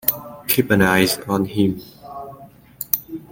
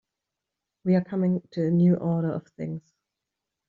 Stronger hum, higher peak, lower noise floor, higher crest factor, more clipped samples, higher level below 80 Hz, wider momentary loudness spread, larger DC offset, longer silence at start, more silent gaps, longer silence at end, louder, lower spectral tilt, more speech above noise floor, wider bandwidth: neither; first, 0 dBFS vs -12 dBFS; second, -43 dBFS vs -86 dBFS; about the same, 20 dB vs 16 dB; neither; first, -50 dBFS vs -66 dBFS; first, 20 LU vs 14 LU; neither; second, 0.05 s vs 0.85 s; neither; second, 0.05 s vs 0.9 s; first, -19 LUFS vs -26 LUFS; second, -4.5 dB/octave vs -10 dB/octave; second, 25 dB vs 62 dB; first, 17 kHz vs 4.6 kHz